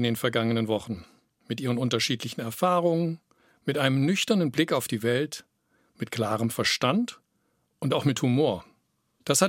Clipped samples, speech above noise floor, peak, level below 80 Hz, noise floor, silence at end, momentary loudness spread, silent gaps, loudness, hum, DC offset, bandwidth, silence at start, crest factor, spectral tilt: under 0.1%; 47 dB; -6 dBFS; -68 dBFS; -72 dBFS; 0 s; 12 LU; none; -26 LUFS; none; under 0.1%; 16.5 kHz; 0 s; 20 dB; -4.5 dB/octave